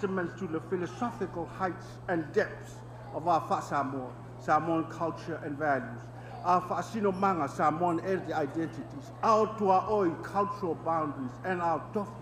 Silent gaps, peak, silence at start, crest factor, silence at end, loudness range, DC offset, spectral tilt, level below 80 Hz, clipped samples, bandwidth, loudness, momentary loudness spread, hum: none; -12 dBFS; 0 s; 18 dB; 0 s; 4 LU; under 0.1%; -7 dB/octave; -60 dBFS; under 0.1%; 14.5 kHz; -31 LUFS; 13 LU; 60 Hz at -45 dBFS